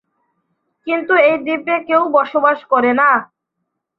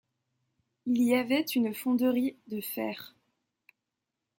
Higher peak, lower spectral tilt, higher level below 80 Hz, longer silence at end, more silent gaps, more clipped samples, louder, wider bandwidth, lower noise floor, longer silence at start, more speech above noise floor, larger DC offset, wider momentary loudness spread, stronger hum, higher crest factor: first, -2 dBFS vs -14 dBFS; first, -7 dB/octave vs -4.5 dB/octave; first, -66 dBFS vs -80 dBFS; second, 0.75 s vs 1.3 s; neither; neither; first, -15 LUFS vs -29 LUFS; second, 5.6 kHz vs 17 kHz; second, -75 dBFS vs -87 dBFS; about the same, 0.85 s vs 0.85 s; about the same, 61 dB vs 58 dB; neither; second, 8 LU vs 13 LU; neither; about the same, 16 dB vs 18 dB